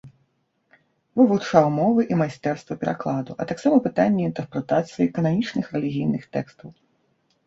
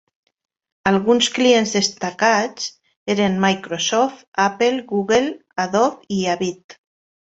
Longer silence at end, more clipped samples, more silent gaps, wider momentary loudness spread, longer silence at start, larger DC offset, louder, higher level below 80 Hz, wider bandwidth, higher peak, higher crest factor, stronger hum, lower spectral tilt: first, 0.75 s vs 0.55 s; neither; second, none vs 2.96-3.06 s, 4.28-4.32 s, 6.64-6.69 s; about the same, 10 LU vs 10 LU; second, 0.05 s vs 0.85 s; neither; second, -22 LUFS vs -19 LUFS; about the same, -60 dBFS vs -58 dBFS; about the same, 7.8 kHz vs 8.2 kHz; about the same, -2 dBFS vs -2 dBFS; about the same, 20 dB vs 18 dB; neither; first, -7.5 dB/octave vs -3.5 dB/octave